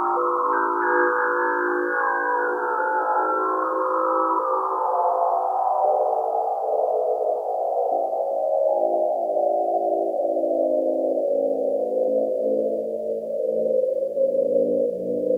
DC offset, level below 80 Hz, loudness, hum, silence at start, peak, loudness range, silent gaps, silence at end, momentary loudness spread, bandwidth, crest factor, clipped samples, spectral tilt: under 0.1%; -72 dBFS; -22 LUFS; none; 0 s; -8 dBFS; 2 LU; none; 0 s; 3 LU; 2.2 kHz; 14 dB; under 0.1%; -7.5 dB/octave